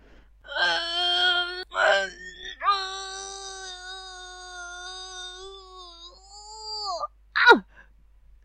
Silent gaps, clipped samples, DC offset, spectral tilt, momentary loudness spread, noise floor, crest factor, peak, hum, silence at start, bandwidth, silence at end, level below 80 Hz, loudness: none; under 0.1%; under 0.1%; -1 dB/octave; 23 LU; -55 dBFS; 26 dB; 0 dBFS; none; 0.45 s; 10.5 kHz; 0.6 s; -56 dBFS; -24 LUFS